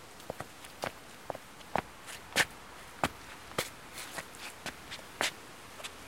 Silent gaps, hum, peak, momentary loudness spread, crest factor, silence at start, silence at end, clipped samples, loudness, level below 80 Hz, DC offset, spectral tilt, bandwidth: none; none; -12 dBFS; 14 LU; 28 dB; 0 s; 0 s; under 0.1%; -38 LUFS; -62 dBFS; 0.1%; -2 dB/octave; 16.5 kHz